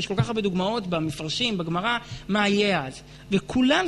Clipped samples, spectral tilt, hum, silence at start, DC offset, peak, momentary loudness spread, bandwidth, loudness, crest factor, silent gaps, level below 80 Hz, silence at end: under 0.1%; -5 dB/octave; none; 0 s; under 0.1%; -8 dBFS; 7 LU; 12 kHz; -25 LUFS; 16 dB; none; -50 dBFS; 0 s